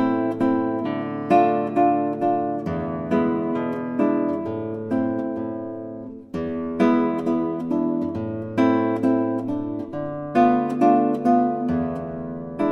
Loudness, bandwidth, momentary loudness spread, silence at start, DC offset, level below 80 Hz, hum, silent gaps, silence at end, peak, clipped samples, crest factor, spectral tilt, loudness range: -23 LUFS; 6.8 kHz; 11 LU; 0 s; under 0.1%; -56 dBFS; none; none; 0 s; -6 dBFS; under 0.1%; 16 dB; -9 dB/octave; 4 LU